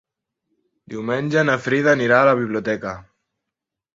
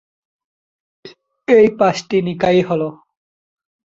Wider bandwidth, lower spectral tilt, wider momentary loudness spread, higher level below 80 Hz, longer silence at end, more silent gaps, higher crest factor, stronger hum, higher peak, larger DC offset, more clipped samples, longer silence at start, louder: about the same, 7.8 kHz vs 7.8 kHz; about the same, -6 dB/octave vs -6.5 dB/octave; first, 16 LU vs 11 LU; about the same, -58 dBFS vs -56 dBFS; about the same, 0.95 s vs 0.95 s; neither; about the same, 20 dB vs 18 dB; neither; about the same, -2 dBFS vs 0 dBFS; neither; neither; second, 0.9 s vs 1.05 s; second, -18 LUFS vs -15 LUFS